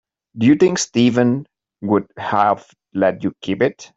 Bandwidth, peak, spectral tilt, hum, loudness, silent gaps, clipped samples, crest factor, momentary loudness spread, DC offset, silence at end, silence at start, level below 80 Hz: 8 kHz; -2 dBFS; -5.5 dB/octave; none; -18 LUFS; none; under 0.1%; 16 dB; 11 LU; under 0.1%; 0.1 s; 0.35 s; -58 dBFS